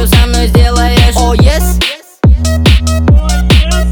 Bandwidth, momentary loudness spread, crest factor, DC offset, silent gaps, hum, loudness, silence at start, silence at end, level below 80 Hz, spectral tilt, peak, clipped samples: 19.5 kHz; 3 LU; 8 dB; under 0.1%; none; none; -9 LUFS; 0 s; 0 s; -10 dBFS; -5 dB/octave; 0 dBFS; 0.2%